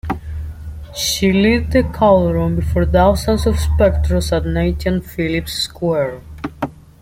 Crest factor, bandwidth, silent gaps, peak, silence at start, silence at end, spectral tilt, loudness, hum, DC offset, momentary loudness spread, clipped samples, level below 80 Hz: 14 dB; 16.5 kHz; none; -2 dBFS; 0.05 s; 0.25 s; -5.5 dB/octave; -16 LUFS; none; under 0.1%; 15 LU; under 0.1%; -26 dBFS